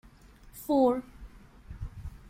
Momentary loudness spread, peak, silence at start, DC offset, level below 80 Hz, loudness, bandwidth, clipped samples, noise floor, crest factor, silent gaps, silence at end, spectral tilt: 25 LU; -14 dBFS; 0.45 s; under 0.1%; -48 dBFS; -27 LUFS; 16.5 kHz; under 0.1%; -54 dBFS; 20 dB; none; 0.15 s; -7 dB/octave